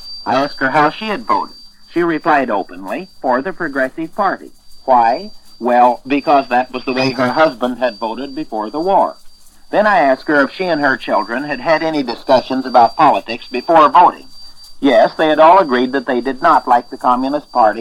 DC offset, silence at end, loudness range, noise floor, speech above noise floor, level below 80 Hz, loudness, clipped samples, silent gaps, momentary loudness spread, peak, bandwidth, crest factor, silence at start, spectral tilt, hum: under 0.1%; 0 s; 6 LU; -36 dBFS; 23 dB; -46 dBFS; -14 LUFS; under 0.1%; none; 12 LU; 0 dBFS; 13 kHz; 14 dB; 0 s; -5.5 dB/octave; none